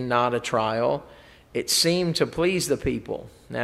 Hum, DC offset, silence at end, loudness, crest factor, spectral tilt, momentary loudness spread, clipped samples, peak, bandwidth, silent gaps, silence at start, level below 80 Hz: none; under 0.1%; 0 s; -24 LUFS; 20 dB; -3.5 dB/octave; 13 LU; under 0.1%; -6 dBFS; 16 kHz; none; 0 s; -50 dBFS